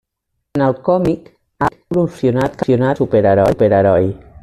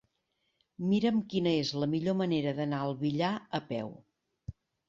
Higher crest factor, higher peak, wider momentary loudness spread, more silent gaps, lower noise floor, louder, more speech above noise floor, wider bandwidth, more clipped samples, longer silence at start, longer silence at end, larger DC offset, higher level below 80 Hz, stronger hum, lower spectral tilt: about the same, 12 dB vs 16 dB; first, -2 dBFS vs -16 dBFS; second, 8 LU vs 16 LU; neither; second, -73 dBFS vs -79 dBFS; first, -15 LUFS vs -31 LUFS; first, 59 dB vs 48 dB; first, 13 kHz vs 7.6 kHz; neither; second, 0.55 s vs 0.8 s; second, 0.05 s vs 0.35 s; neither; first, -44 dBFS vs -64 dBFS; neither; first, -8.5 dB/octave vs -7 dB/octave